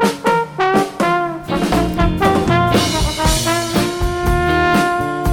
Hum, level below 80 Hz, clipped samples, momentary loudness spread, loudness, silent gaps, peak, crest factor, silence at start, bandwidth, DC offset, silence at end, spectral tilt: none; -26 dBFS; under 0.1%; 5 LU; -16 LUFS; none; -2 dBFS; 14 dB; 0 s; 19 kHz; under 0.1%; 0 s; -5 dB/octave